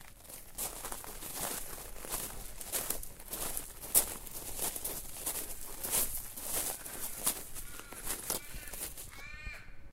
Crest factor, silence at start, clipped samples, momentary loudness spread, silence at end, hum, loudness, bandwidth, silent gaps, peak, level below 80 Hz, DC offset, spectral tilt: 30 dB; 0 s; under 0.1%; 14 LU; 0 s; none; -37 LUFS; 16.5 kHz; none; -10 dBFS; -50 dBFS; under 0.1%; -1 dB/octave